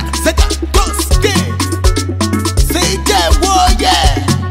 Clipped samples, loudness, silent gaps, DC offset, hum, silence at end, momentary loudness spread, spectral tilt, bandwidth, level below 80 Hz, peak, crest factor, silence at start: under 0.1%; -12 LUFS; none; under 0.1%; none; 0 s; 5 LU; -4 dB/octave; 16.5 kHz; -16 dBFS; 0 dBFS; 12 dB; 0 s